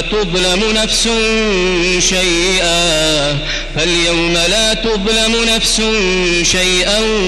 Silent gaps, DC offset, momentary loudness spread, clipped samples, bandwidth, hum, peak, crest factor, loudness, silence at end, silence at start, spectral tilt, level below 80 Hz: none; under 0.1%; 3 LU; under 0.1%; 13.5 kHz; none; -2 dBFS; 10 dB; -12 LUFS; 0 s; 0 s; -2.5 dB/octave; -26 dBFS